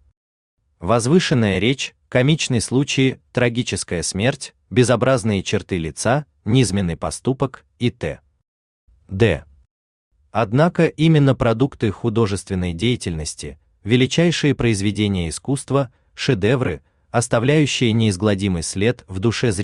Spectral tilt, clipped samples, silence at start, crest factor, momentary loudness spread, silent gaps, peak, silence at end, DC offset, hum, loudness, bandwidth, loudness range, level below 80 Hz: -5.5 dB/octave; under 0.1%; 0.8 s; 16 dB; 9 LU; 8.48-8.88 s, 9.71-10.11 s; -2 dBFS; 0 s; under 0.1%; none; -19 LUFS; 12 kHz; 4 LU; -46 dBFS